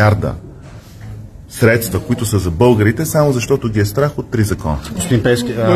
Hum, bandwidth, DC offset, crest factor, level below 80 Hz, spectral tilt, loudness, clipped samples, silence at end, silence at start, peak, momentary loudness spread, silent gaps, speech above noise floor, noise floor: none; 13.5 kHz; under 0.1%; 14 dB; -34 dBFS; -6 dB/octave; -15 LUFS; under 0.1%; 0 s; 0 s; 0 dBFS; 20 LU; none; 21 dB; -35 dBFS